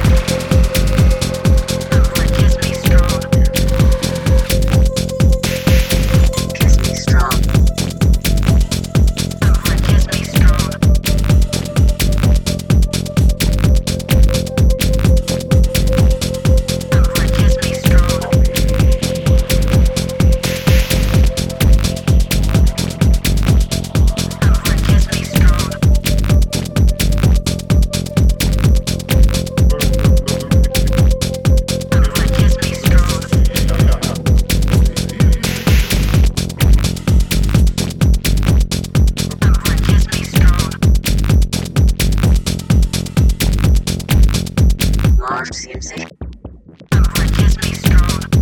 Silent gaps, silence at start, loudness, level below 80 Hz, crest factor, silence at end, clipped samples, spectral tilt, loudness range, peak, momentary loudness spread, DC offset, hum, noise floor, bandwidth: none; 0 s; -15 LUFS; -14 dBFS; 12 dB; 0 s; under 0.1%; -5.5 dB/octave; 1 LU; 0 dBFS; 3 LU; under 0.1%; none; -35 dBFS; 17.5 kHz